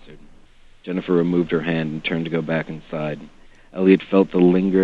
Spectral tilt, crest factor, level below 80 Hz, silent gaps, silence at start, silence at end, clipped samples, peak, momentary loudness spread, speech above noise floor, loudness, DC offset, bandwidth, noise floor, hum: -9 dB/octave; 18 dB; -50 dBFS; none; 0.05 s; 0 s; under 0.1%; -2 dBFS; 13 LU; 28 dB; -20 LUFS; under 0.1%; 6 kHz; -47 dBFS; none